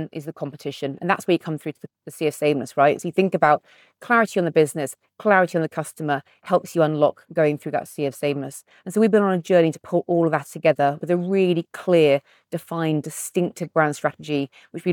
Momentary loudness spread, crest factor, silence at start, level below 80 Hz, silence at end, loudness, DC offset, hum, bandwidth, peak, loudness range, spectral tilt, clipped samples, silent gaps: 12 LU; 18 dB; 0 s; -76 dBFS; 0 s; -22 LUFS; under 0.1%; none; 19 kHz; -4 dBFS; 3 LU; -6 dB/octave; under 0.1%; none